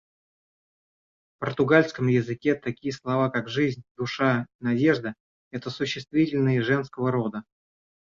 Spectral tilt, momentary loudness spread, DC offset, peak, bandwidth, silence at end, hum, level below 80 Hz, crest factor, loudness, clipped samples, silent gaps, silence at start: -7 dB/octave; 12 LU; under 0.1%; -6 dBFS; 7.6 kHz; 0.8 s; none; -62 dBFS; 20 dB; -25 LUFS; under 0.1%; 3.91-3.95 s, 4.55-4.59 s, 5.20-5.51 s; 1.4 s